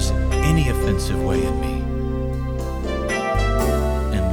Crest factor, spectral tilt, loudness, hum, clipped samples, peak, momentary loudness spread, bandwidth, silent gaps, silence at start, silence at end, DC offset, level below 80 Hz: 14 dB; -6 dB/octave; -22 LUFS; none; under 0.1%; -6 dBFS; 7 LU; 18 kHz; none; 0 s; 0 s; under 0.1%; -24 dBFS